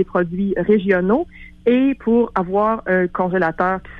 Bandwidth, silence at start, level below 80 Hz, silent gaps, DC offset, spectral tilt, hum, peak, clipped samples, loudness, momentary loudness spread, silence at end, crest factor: 5.2 kHz; 0 s; -44 dBFS; none; under 0.1%; -9.5 dB/octave; none; -4 dBFS; under 0.1%; -18 LUFS; 4 LU; 0 s; 14 dB